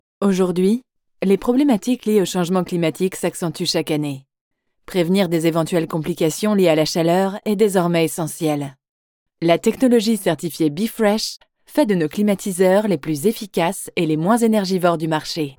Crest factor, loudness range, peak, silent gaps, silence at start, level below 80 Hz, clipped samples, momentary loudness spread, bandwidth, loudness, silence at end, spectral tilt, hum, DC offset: 16 dB; 3 LU; -2 dBFS; 4.41-4.51 s, 8.89-9.26 s; 0.2 s; -56 dBFS; under 0.1%; 7 LU; over 20 kHz; -19 LUFS; 0.05 s; -5.5 dB/octave; none; under 0.1%